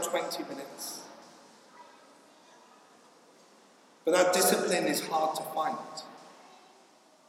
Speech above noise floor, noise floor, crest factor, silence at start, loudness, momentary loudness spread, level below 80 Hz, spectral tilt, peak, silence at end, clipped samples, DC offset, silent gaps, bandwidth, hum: 31 dB; -60 dBFS; 22 dB; 0 s; -29 LUFS; 24 LU; under -90 dBFS; -2.5 dB/octave; -12 dBFS; 0.8 s; under 0.1%; under 0.1%; none; 16.5 kHz; none